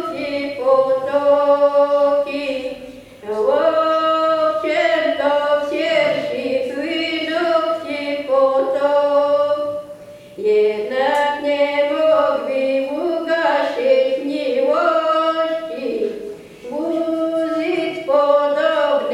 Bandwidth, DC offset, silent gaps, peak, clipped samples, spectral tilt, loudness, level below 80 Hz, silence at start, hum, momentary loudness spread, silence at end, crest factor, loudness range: 11 kHz; under 0.1%; none; -4 dBFS; under 0.1%; -4.5 dB/octave; -18 LUFS; -60 dBFS; 0 s; none; 9 LU; 0 s; 14 dB; 3 LU